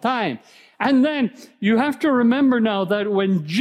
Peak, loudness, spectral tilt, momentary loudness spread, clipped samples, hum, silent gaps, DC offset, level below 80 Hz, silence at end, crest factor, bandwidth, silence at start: -6 dBFS; -20 LUFS; -6.5 dB/octave; 8 LU; under 0.1%; none; none; under 0.1%; -70 dBFS; 0 s; 12 dB; 12.5 kHz; 0.05 s